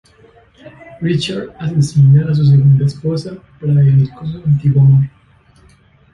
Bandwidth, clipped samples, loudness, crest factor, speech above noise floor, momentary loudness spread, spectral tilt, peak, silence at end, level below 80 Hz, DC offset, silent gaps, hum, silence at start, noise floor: 9.4 kHz; under 0.1%; -13 LUFS; 12 dB; 36 dB; 13 LU; -8 dB/octave; -2 dBFS; 1.05 s; -44 dBFS; under 0.1%; none; none; 0.9 s; -48 dBFS